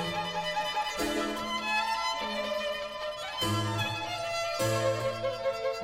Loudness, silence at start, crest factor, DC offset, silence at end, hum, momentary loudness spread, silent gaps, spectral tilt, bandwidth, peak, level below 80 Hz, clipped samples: -31 LUFS; 0 s; 16 dB; under 0.1%; 0 s; none; 4 LU; none; -4 dB/octave; 16.5 kHz; -16 dBFS; -58 dBFS; under 0.1%